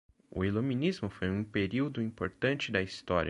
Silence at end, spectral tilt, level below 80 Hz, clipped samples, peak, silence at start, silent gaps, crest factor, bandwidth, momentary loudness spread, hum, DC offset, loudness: 0 s; -6.5 dB/octave; -52 dBFS; under 0.1%; -14 dBFS; 0.35 s; none; 18 dB; 11 kHz; 5 LU; none; under 0.1%; -33 LUFS